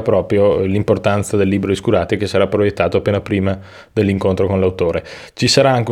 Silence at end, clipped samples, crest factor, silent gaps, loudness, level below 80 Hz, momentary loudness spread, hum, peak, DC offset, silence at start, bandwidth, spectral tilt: 0 s; under 0.1%; 16 dB; none; -16 LUFS; -46 dBFS; 6 LU; none; 0 dBFS; under 0.1%; 0 s; 14.5 kHz; -6 dB/octave